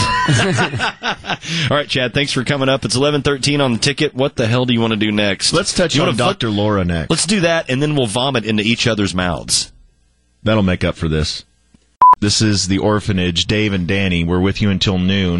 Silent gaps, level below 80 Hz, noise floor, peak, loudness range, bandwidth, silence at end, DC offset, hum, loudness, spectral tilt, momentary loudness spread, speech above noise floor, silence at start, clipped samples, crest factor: none; -38 dBFS; -57 dBFS; -2 dBFS; 2 LU; 11.5 kHz; 0 s; under 0.1%; none; -16 LUFS; -4.5 dB/octave; 5 LU; 41 dB; 0 s; under 0.1%; 14 dB